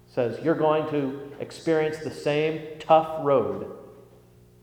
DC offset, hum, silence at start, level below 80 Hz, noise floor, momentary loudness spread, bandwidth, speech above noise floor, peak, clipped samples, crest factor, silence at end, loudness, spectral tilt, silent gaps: under 0.1%; none; 0.15 s; -62 dBFS; -53 dBFS; 15 LU; 14 kHz; 29 dB; -6 dBFS; under 0.1%; 20 dB; 0.6 s; -25 LUFS; -6.5 dB/octave; none